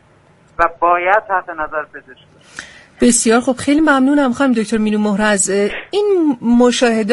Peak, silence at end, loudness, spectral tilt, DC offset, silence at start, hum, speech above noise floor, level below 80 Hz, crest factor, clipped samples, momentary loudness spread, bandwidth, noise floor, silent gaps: 0 dBFS; 0 s; -14 LUFS; -3.5 dB/octave; under 0.1%; 0.6 s; none; 35 dB; -44 dBFS; 14 dB; under 0.1%; 13 LU; 11.5 kHz; -49 dBFS; none